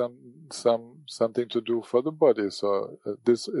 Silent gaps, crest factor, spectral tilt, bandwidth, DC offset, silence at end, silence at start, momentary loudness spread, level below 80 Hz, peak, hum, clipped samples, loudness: none; 18 dB; -5.5 dB/octave; 11.5 kHz; under 0.1%; 0 s; 0 s; 10 LU; -80 dBFS; -8 dBFS; none; under 0.1%; -26 LUFS